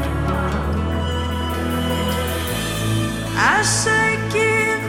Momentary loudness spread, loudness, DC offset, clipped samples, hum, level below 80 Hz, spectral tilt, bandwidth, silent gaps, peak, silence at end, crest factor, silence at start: 7 LU; -19 LUFS; under 0.1%; under 0.1%; none; -32 dBFS; -4 dB/octave; 17.5 kHz; none; -4 dBFS; 0 s; 16 dB; 0 s